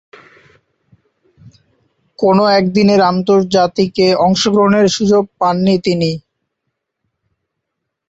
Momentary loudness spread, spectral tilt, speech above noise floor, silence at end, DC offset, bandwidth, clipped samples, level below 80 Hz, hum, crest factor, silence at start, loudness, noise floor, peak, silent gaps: 5 LU; -5.5 dB/octave; 64 dB; 1.9 s; under 0.1%; 8 kHz; under 0.1%; -52 dBFS; none; 14 dB; 2.2 s; -12 LUFS; -76 dBFS; 0 dBFS; none